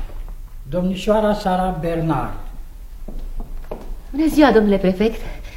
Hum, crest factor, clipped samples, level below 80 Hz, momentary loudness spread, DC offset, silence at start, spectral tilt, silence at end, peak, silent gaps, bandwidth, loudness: none; 20 dB; under 0.1%; -30 dBFS; 24 LU; under 0.1%; 0 s; -7 dB/octave; 0 s; 0 dBFS; none; 16.5 kHz; -18 LUFS